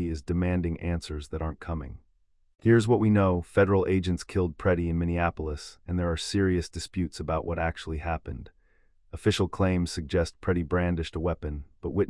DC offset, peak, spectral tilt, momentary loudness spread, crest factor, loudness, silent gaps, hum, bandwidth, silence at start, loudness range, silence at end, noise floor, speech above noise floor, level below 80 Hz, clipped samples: under 0.1%; -10 dBFS; -6.5 dB/octave; 13 LU; 18 dB; -28 LUFS; none; none; 12 kHz; 0 s; 5 LU; 0 s; -65 dBFS; 38 dB; -44 dBFS; under 0.1%